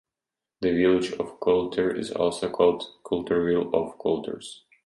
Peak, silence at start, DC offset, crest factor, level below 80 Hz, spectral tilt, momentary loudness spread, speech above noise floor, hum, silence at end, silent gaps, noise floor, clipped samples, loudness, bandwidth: -8 dBFS; 0.6 s; under 0.1%; 18 dB; -56 dBFS; -6 dB/octave; 8 LU; 64 dB; none; 0.3 s; none; -89 dBFS; under 0.1%; -25 LUFS; 11.5 kHz